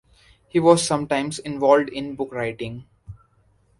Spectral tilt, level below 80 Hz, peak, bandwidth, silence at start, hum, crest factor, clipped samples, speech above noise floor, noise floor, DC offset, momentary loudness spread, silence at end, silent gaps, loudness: -5 dB/octave; -54 dBFS; -2 dBFS; 11.5 kHz; 0.55 s; none; 22 dB; under 0.1%; 40 dB; -61 dBFS; under 0.1%; 14 LU; 0.65 s; none; -21 LUFS